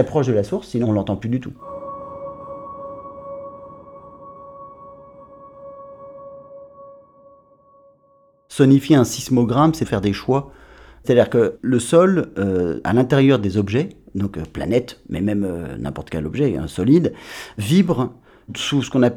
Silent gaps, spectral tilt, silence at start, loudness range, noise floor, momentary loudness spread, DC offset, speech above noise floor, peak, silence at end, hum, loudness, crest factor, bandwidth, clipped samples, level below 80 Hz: none; -6.5 dB/octave; 0 s; 21 LU; -56 dBFS; 24 LU; under 0.1%; 38 dB; -2 dBFS; 0 s; none; -19 LUFS; 18 dB; 17 kHz; under 0.1%; -48 dBFS